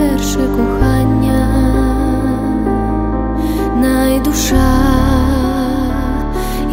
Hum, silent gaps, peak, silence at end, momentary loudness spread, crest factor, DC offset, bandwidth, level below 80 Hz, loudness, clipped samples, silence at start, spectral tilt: none; none; 0 dBFS; 0 s; 5 LU; 12 dB; under 0.1%; 16.5 kHz; -18 dBFS; -14 LUFS; under 0.1%; 0 s; -6 dB/octave